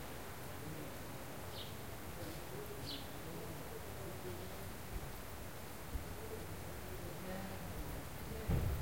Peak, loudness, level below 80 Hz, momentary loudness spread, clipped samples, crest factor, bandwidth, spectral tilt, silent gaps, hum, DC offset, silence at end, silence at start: -24 dBFS; -47 LUFS; -52 dBFS; 3 LU; under 0.1%; 20 dB; 16.5 kHz; -5 dB/octave; none; none; 0.2%; 0 s; 0 s